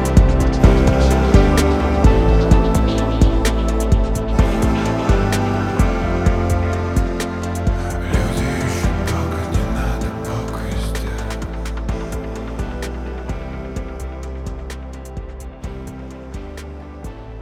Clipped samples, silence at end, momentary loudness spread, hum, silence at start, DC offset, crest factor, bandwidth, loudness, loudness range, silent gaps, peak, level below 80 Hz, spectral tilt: under 0.1%; 0 s; 18 LU; none; 0 s; under 0.1%; 16 dB; 14.5 kHz; -19 LUFS; 14 LU; none; 0 dBFS; -20 dBFS; -6.5 dB/octave